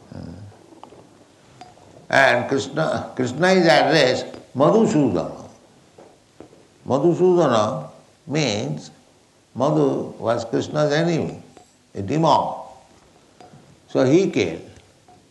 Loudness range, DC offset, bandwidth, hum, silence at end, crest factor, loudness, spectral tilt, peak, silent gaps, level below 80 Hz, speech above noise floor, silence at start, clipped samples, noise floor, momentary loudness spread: 5 LU; under 0.1%; 11.5 kHz; none; 0.6 s; 18 dB; -19 LUFS; -5.5 dB/octave; -2 dBFS; none; -60 dBFS; 37 dB; 0.15 s; under 0.1%; -55 dBFS; 20 LU